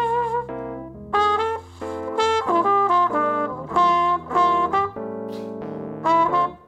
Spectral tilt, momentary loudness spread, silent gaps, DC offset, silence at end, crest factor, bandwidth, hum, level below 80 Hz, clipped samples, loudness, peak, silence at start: -5 dB/octave; 14 LU; none; under 0.1%; 0.1 s; 16 dB; 10 kHz; none; -54 dBFS; under 0.1%; -21 LUFS; -6 dBFS; 0 s